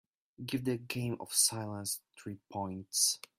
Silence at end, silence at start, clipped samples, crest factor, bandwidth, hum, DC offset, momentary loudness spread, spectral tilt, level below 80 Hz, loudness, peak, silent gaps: 0.2 s; 0.4 s; under 0.1%; 22 dB; 16 kHz; none; under 0.1%; 15 LU; -2.5 dB/octave; -72 dBFS; -33 LUFS; -14 dBFS; none